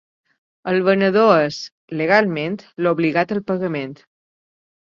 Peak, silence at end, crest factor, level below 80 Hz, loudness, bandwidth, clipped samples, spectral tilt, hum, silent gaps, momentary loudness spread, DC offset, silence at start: 0 dBFS; 0.9 s; 18 dB; -64 dBFS; -18 LUFS; 7.4 kHz; under 0.1%; -6.5 dB/octave; none; 1.72-1.88 s; 14 LU; under 0.1%; 0.65 s